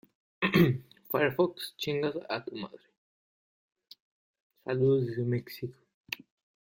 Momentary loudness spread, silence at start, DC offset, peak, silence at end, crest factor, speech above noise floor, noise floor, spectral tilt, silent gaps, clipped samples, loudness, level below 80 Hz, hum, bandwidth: 16 LU; 0.4 s; under 0.1%; -12 dBFS; 0.55 s; 22 dB; over 61 dB; under -90 dBFS; -7 dB/octave; 2.97-3.76 s, 4.00-4.34 s, 4.40-4.50 s, 5.94-6.04 s; under 0.1%; -30 LUFS; -64 dBFS; none; 16.5 kHz